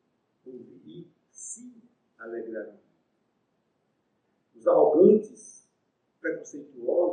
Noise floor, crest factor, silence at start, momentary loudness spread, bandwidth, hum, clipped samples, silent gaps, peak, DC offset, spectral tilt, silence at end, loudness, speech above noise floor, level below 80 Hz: -75 dBFS; 22 dB; 0.45 s; 28 LU; 10 kHz; none; under 0.1%; none; -8 dBFS; under 0.1%; -7 dB/octave; 0 s; -24 LUFS; 49 dB; -86 dBFS